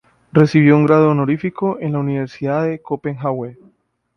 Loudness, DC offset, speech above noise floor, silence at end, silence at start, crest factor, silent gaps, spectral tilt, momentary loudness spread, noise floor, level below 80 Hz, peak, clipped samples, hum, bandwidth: -17 LUFS; under 0.1%; 41 dB; 0.65 s; 0.35 s; 16 dB; none; -9 dB/octave; 12 LU; -57 dBFS; -56 dBFS; 0 dBFS; under 0.1%; none; 6.6 kHz